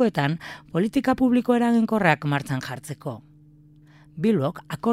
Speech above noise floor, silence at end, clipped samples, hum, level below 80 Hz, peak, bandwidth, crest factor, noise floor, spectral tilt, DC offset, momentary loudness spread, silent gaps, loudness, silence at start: 29 dB; 0 s; under 0.1%; none; -56 dBFS; -4 dBFS; 14.5 kHz; 20 dB; -52 dBFS; -7 dB/octave; under 0.1%; 14 LU; none; -23 LUFS; 0 s